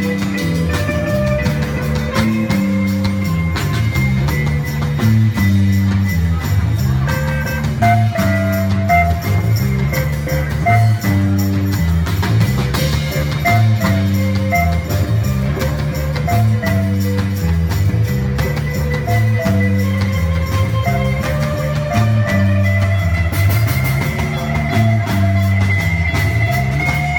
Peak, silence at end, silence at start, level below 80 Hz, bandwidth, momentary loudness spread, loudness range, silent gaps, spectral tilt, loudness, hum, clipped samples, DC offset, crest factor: -2 dBFS; 0 s; 0 s; -28 dBFS; 18 kHz; 5 LU; 1 LU; none; -6.5 dB/octave; -16 LUFS; none; under 0.1%; under 0.1%; 14 dB